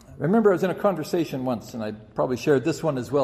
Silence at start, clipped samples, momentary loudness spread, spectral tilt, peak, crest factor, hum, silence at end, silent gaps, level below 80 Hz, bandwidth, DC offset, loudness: 0.1 s; under 0.1%; 11 LU; -6.5 dB/octave; -8 dBFS; 16 dB; none; 0 s; none; -58 dBFS; 14.5 kHz; under 0.1%; -24 LUFS